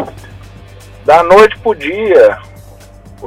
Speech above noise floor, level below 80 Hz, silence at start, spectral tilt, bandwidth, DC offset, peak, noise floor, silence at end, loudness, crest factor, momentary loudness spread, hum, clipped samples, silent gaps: 28 dB; -38 dBFS; 0 s; -5 dB/octave; 15 kHz; under 0.1%; 0 dBFS; -35 dBFS; 0 s; -9 LUFS; 12 dB; 15 LU; none; 1%; none